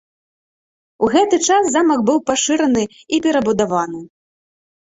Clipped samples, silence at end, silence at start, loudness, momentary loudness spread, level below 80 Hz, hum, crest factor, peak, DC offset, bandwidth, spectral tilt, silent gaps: under 0.1%; 0.9 s; 1 s; -16 LUFS; 7 LU; -54 dBFS; none; 16 dB; -2 dBFS; under 0.1%; 8 kHz; -3.5 dB/octave; none